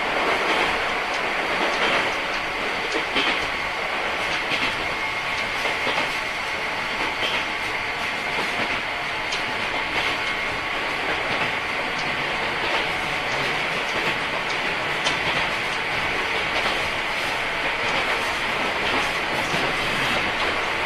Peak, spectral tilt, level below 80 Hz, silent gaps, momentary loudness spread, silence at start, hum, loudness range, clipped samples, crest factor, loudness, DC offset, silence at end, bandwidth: -8 dBFS; -2.5 dB/octave; -46 dBFS; none; 3 LU; 0 s; none; 2 LU; under 0.1%; 16 dB; -22 LUFS; under 0.1%; 0 s; 14 kHz